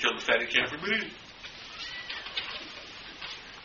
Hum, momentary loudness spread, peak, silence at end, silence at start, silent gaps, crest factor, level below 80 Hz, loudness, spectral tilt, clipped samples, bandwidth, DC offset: none; 17 LU; -8 dBFS; 0 s; 0 s; none; 26 dB; -62 dBFS; -31 LUFS; 0.5 dB/octave; under 0.1%; 7.2 kHz; under 0.1%